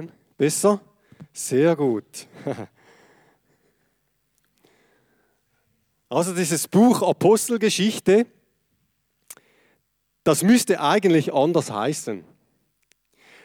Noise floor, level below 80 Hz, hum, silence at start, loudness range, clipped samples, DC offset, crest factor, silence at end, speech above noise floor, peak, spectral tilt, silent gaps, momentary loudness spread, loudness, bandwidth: -72 dBFS; -68 dBFS; none; 0 s; 11 LU; under 0.1%; under 0.1%; 16 dB; 1.25 s; 52 dB; -6 dBFS; -5 dB/octave; none; 16 LU; -21 LUFS; 18 kHz